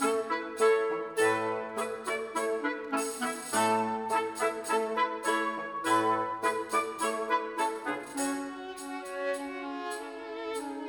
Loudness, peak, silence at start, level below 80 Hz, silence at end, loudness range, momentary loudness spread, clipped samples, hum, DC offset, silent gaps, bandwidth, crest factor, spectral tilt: -31 LUFS; -14 dBFS; 0 s; -74 dBFS; 0 s; 4 LU; 10 LU; under 0.1%; none; under 0.1%; none; 19.5 kHz; 16 dB; -3 dB/octave